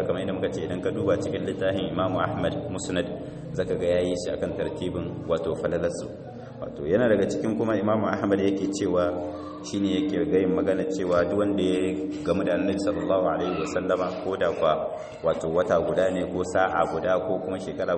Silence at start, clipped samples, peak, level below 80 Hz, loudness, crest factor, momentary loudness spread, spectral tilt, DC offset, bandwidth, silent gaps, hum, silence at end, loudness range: 0 s; under 0.1%; -8 dBFS; -52 dBFS; -26 LUFS; 18 dB; 8 LU; -6 dB/octave; under 0.1%; 8.8 kHz; none; none; 0 s; 3 LU